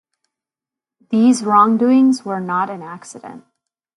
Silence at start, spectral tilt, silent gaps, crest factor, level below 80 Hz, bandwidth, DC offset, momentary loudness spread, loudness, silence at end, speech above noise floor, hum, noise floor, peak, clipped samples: 1.1 s; -5.5 dB/octave; none; 18 dB; -70 dBFS; 11.5 kHz; under 0.1%; 20 LU; -15 LUFS; 0.6 s; 73 dB; none; -88 dBFS; 0 dBFS; under 0.1%